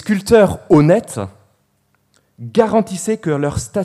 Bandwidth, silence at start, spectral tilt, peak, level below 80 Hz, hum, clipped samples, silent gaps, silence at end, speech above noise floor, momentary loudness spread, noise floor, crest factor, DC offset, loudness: 15 kHz; 0 s; -6.5 dB/octave; 0 dBFS; -42 dBFS; 50 Hz at -50 dBFS; under 0.1%; none; 0 s; 48 dB; 16 LU; -62 dBFS; 16 dB; under 0.1%; -15 LUFS